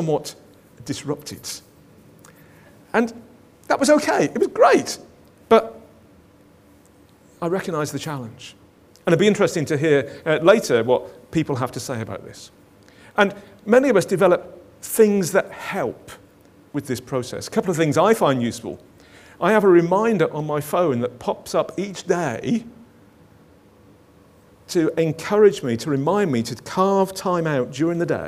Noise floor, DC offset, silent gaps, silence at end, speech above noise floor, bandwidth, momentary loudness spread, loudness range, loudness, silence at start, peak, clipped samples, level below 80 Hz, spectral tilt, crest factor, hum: -52 dBFS; under 0.1%; none; 0 s; 32 dB; 16 kHz; 16 LU; 7 LU; -20 LUFS; 0 s; 0 dBFS; under 0.1%; -60 dBFS; -5.5 dB/octave; 20 dB; none